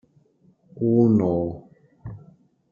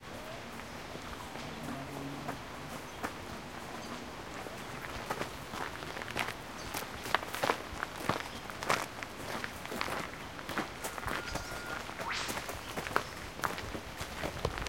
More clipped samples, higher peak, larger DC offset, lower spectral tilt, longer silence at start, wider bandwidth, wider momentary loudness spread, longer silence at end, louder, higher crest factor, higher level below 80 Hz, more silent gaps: neither; about the same, -6 dBFS vs -8 dBFS; second, under 0.1% vs 0.1%; first, -12 dB/octave vs -3.5 dB/octave; first, 0.75 s vs 0 s; second, 2.4 kHz vs 17 kHz; first, 23 LU vs 9 LU; first, 0.55 s vs 0 s; first, -21 LUFS vs -39 LUFS; second, 18 dB vs 32 dB; about the same, -56 dBFS vs -54 dBFS; neither